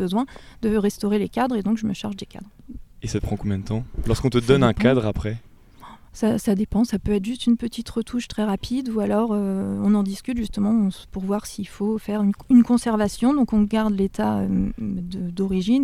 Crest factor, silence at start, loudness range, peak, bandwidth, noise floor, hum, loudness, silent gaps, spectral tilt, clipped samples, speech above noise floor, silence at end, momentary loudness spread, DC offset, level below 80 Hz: 20 dB; 0 s; 5 LU; -2 dBFS; 15 kHz; -45 dBFS; none; -22 LUFS; none; -7 dB/octave; under 0.1%; 23 dB; 0 s; 11 LU; under 0.1%; -40 dBFS